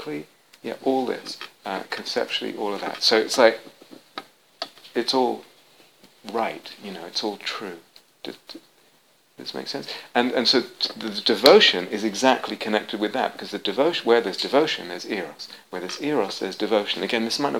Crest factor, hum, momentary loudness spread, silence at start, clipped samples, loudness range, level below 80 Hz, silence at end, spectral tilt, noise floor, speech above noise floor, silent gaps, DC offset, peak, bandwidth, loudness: 24 dB; none; 19 LU; 0 s; under 0.1%; 12 LU; -72 dBFS; 0 s; -3 dB/octave; -60 dBFS; 37 dB; none; under 0.1%; 0 dBFS; 19 kHz; -22 LUFS